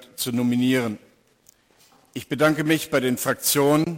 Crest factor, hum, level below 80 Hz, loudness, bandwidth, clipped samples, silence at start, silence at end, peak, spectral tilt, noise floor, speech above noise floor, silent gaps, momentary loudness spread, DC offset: 16 dB; none; -62 dBFS; -22 LUFS; 17 kHz; under 0.1%; 0.2 s; 0 s; -8 dBFS; -4.5 dB/octave; -58 dBFS; 37 dB; none; 14 LU; under 0.1%